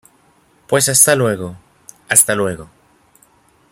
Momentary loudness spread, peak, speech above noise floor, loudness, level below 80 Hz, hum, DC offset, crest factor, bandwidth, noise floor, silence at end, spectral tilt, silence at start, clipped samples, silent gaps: 16 LU; 0 dBFS; 40 dB; -13 LUFS; -54 dBFS; none; under 0.1%; 18 dB; 16.5 kHz; -54 dBFS; 1.05 s; -2.5 dB/octave; 0.7 s; under 0.1%; none